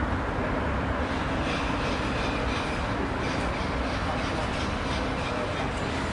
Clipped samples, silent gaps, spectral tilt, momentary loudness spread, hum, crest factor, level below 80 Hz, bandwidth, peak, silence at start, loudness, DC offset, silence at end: under 0.1%; none; -5.5 dB/octave; 1 LU; none; 12 dB; -36 dBFS; 11.5 kHz; -16 dBFS; 0 s; -28 LUFS; under 0.1%; 0 s